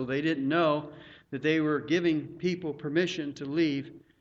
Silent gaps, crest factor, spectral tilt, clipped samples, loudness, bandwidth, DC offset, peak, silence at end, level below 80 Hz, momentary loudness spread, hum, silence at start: none; 16 dB; -6.5 dB/octave; under 0.1%; -29 LUFS; 7.6 kHz; under 0.1%; -14 dBFS; 0.2 s; -68 dBFS; 9 LU; none; 0 s